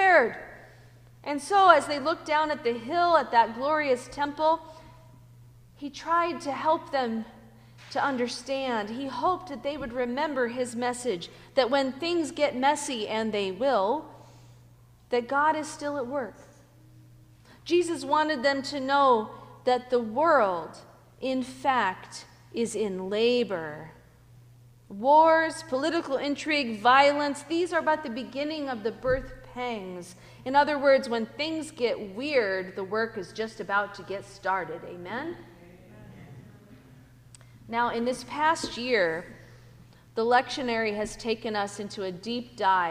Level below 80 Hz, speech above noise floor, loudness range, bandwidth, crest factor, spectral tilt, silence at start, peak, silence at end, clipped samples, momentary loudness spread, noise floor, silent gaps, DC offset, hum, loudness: -58 dBFS; 28 dB; 7 LU; 15.5 kHz; 24 dB; -4 dB/octave; 0 s; -2 dBFS; 0 s; under 0.1%; 14 LU; -55 dBFS; none; under 0.1%; none; -27 LUFS